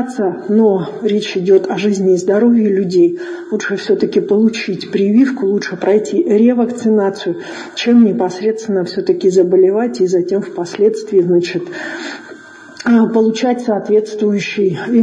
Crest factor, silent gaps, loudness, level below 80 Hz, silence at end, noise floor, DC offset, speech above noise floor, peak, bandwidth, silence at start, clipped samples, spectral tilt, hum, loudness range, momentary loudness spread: 12 dB; none; -14 LUFS; -62 dBFS; 0 s; -35 dBFS; under 0.1%; 22 dB; 0 dBFS; 9.8 kHz; 0 s; under 0.1%; -6 dB/octave; none; 2 LU; 10 LU